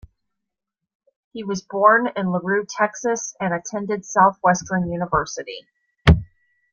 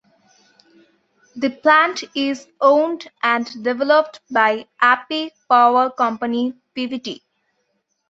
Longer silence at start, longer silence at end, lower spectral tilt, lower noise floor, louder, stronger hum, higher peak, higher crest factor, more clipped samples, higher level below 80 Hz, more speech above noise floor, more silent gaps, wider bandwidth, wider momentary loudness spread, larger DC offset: about the same, 1.35 s vs 1.35 s; second, 0.45 s vs 0.95 s; first, -5.5 dB/octave vs -3.5 dB/octave; first, -84 dBFS vs -70 dBFS; about the same, -20 LUFS vs -18 LUFS; neither; about the same, -2 dBFS vs -2 dBFS; about the same, 20 dB vs 18 dB; neither; first, -36 dBFS vs -70 dBFS; first, 63 dB vs 52 dB; neither; about the same, 7.4 kHz vs 7.8 kHz; about the same, 14 LU vs 12 LU; neither